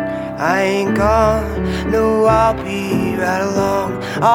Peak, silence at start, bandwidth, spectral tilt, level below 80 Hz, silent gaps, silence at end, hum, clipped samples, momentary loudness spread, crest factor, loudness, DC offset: 0 dBFS; 0 s; 17 kHz; -6 dB/octave; -32 dBFS; none; 0 s; none; under 0.1%; 7 LU; 16 dB; -16 LUFS; under 0.1%